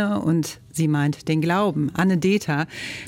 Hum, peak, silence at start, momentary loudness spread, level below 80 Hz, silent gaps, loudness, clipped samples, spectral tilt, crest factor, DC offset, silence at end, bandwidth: none; -10 dBFS; 0 s; 5 LU; -56 dBFS; none; -22 LUFS; under 0.1%; -6 dB/octave; 12 dB; under 0.1%; 0 s; 16.5 kHz